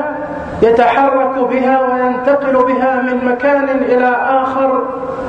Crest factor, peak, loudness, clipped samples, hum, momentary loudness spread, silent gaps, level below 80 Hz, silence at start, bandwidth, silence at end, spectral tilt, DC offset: 12 dB; 0 dBFS; -13 LUFS; under 0.1%; none; 5 LU; none; -46 dBFS; 0 s; 7.4 kHz; 0 s; -7 dB/octave; under 0.1%